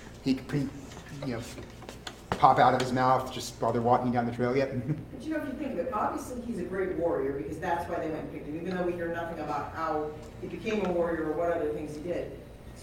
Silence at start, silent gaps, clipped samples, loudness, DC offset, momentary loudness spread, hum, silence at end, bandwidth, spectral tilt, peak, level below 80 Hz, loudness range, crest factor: 0 s; none; under 0.1%; -30 LUFS; under 0.1%; 14 LU; none; 0 s; 17 kHz; -6 dB/octave; -6 dBFS; -52 dBFS; 6 LU; 26 dB